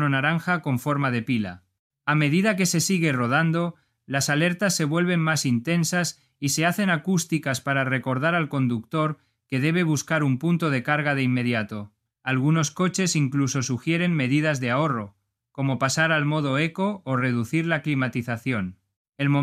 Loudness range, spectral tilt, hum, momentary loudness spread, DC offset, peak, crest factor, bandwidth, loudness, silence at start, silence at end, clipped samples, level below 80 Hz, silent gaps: 2 LU; -5 dB/octave; none; 7 LU; under 0.1%; -6 dBFS; 18 dB; 15.5 kHz; -24 LUFS; 0 s; 0 s; under 0.1%; -66 dBFS; 1.79-1.90 s, 18.96-19.05 s